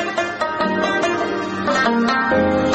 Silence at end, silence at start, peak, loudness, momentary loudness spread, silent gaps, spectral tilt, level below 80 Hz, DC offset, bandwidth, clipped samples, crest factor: 0 s; 0 s; -4 dBFS; -18 LUFS; 5 LU; none; -5 dB/octave; -48 dBFS; under 0.1%; 8.8 kHz; under 0.1%; 14 dB